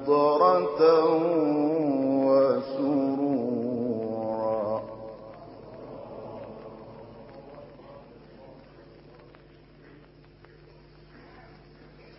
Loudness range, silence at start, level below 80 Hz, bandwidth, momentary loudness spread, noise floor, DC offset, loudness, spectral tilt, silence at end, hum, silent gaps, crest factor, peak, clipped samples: 24 LU; 0 s; -62 dBFS; 5.8 kHz; 25 LU; -53 dBFS; under 0.1%; -25 LUFS; -11 dB/octave; 0.8 s; none; none; 20 dB; -8 dBFS; under 0.1%